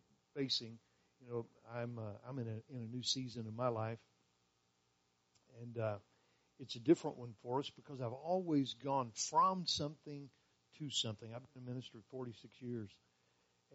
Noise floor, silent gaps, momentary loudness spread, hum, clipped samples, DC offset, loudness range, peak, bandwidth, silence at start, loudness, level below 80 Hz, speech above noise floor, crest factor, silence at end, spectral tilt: -80 dBFS; none; 17 LU; 60 Hz at -70 dBFS; under 0.1%; under 0.1%; 8 LU; -18 dBFS; 8 kHz; 0.35 s; -41 LUFS; -82 dBFS; 38 dB; 24 dB; 0.8 s; -4.5 dB/octave